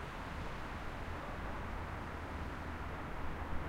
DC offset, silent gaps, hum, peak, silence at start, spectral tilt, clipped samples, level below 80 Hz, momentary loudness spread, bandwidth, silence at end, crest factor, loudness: under 0.1%; none; none; -26 dBFS; 0 s; -6 dB/octave; under 0.1%; -46 dBFS; 1 LU; 16 kHz; 0 s; 16 dB; -44 LUFS